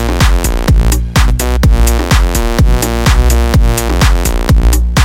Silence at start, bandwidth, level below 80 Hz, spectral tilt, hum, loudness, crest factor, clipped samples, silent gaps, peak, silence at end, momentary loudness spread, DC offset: 0 s; 16.5 kHz; -10 dBFS; -5 dB/octave; none; -11 LUFS; 8 dB; under 0.1%; none; 0 dBFS; 0 s; 2 LU; under 0.1%